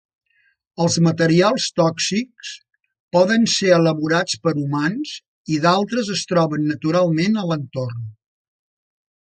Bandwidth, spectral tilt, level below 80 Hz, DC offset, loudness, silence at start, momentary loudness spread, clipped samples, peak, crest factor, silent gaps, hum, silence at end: 9.4 kHz; -5 dB/octave; -62 dBFS; under 0.1%; -19 LUFS; 0.8 s; 15 LU; under 0.1%; -2 dBFS; 18 dB; 3.00-3.08 s, 5.28-5.45 s; none; 1.1 s